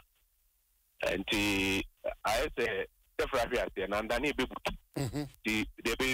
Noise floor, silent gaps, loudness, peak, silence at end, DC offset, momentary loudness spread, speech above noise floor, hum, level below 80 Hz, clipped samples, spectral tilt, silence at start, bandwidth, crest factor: -73 dBFS; none; -33 LUFS; -20 dBFS; 0 s; under 0.1%; 8 LU; 40 dB; none; -50 dBFS; under 0.1%; -4 dB/octave; 1 s; 16 kHz; 14 dB